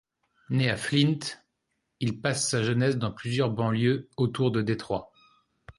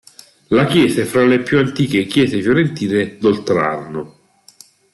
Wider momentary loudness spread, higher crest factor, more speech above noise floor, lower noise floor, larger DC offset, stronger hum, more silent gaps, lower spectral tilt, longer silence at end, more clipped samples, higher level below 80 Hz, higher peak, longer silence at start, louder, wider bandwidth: about the same, 8 LU vs 8 LU; about the same, 18 dB vs 14 dB; first, 53 dB vs 32 dB; first, -79 dBFS vs -47 dBFS; neither; neither; neither; about the same, -5 dB/octave vs -6 dB/octave; second, 0.1 s vs 0.85 s; neither; second, -58 dBFS vs -52 dBFS; second, -10 dBFS vs -2 dBFS; about the same, 0.5 s vs 0.5 s; second, -27 LUFS vs -15 LUFS; about the same, 11.5 kHz vs 12.5 kHz